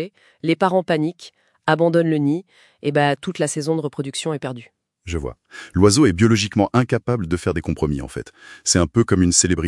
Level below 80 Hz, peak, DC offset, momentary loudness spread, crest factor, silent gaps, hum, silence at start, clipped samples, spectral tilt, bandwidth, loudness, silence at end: -44 dBFS; 0 dBFS; under 0.1%; 14 LU; 20 dB; none; none; 0 s; under 0.1%; -5 dB/octave; 12 kHz; -19 LUFS; 0 s